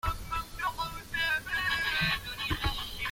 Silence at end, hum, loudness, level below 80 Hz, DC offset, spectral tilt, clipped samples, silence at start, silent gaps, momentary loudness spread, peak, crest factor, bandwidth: 0 s; none; -31 LUFS; -42 dBFS; under 0.1%; -3 dB/octave; under 0.1%; 0.05 s; none; 7 LU; -16 dBFS; 16 dB; 16.5 kHz